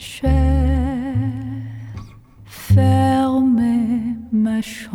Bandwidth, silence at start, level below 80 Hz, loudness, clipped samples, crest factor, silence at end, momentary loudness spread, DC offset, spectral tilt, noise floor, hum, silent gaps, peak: 16 kHz; 0 s; -26 dBFS; -18 LUFS; under 0.1%; 14 dB; 0 s; 16 LU; under 0.1%; -7.5 dB/octave; -42 dBFS; none; none; -4 dBFS